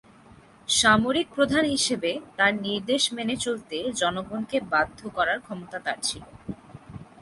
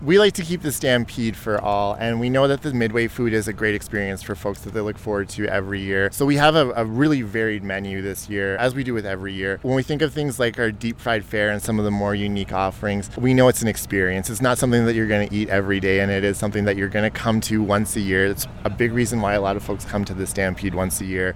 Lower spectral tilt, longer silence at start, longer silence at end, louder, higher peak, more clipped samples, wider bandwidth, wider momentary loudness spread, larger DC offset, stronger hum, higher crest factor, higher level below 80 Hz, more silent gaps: second, -2.5 dB/octave vs -5 dB/octave; first, 0.7 s vs 0 s; first, 0.15 s vs 0 s; second, -25 LUFS vs -21 LUFS; second, -6 dBFS vs -2 dBFS; neither; second, 11.5 kHz vs 18.5 kHz; first, 19 LU vs 8 LU; neither; neither; about the same, 20 dB vs 18 dB; second, -56 dBFS vs -42 dBFS; neither